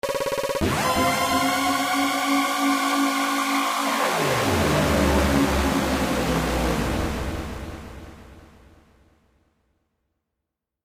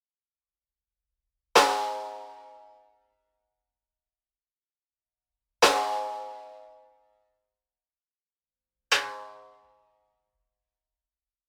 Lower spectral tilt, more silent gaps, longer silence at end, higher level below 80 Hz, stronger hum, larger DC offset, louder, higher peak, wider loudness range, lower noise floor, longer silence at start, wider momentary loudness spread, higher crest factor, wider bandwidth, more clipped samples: first, -4 dB/octave vs -0.5 dB/octave; second, none vs 8.21-8.26 s; first, 2.4 s vs 2.1 s; first, -36 dBFS vs -72 dBFS; neither; neither; first, -22 LUFS vs -25 LUFS; second, -8 dBFS vs -4 dBFS; first, 10 LU vs 5 LU; second, -83 dBFS vs under -90 dBFS; second, 0.05 s vs 1.55 s; second, 9 LU vs 23 LU; second, 16 dB vs 30 dB; second, 15.5 kHz vs over 20 kHz; neither